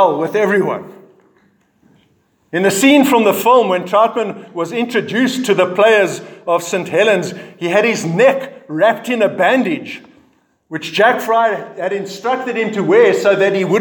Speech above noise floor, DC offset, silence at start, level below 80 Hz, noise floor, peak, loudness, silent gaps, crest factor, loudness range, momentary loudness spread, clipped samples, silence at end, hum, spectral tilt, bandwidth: 44 dB; under 0.1%; 0 s; -68 dBFS; -58 dBFS; 0 dBFS; -14 LUFS; none; 14 dB; 3 LU; 12 LU; under 0.1%; 0 s; none; -4.5 dB/octave; 19.5 kHz